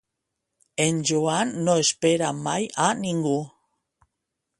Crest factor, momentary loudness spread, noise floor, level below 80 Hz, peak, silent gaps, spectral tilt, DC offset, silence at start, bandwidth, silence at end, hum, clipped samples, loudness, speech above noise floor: 20 dB; 6 LU; -82 dBFS; -66 dBFS; -4 dBFS; none; -4 dB/octave; under 0.1%; 0.8 s; 11.5 kHz; 1.1 s; none; under 0.1%; -23 LUFS; 59 dB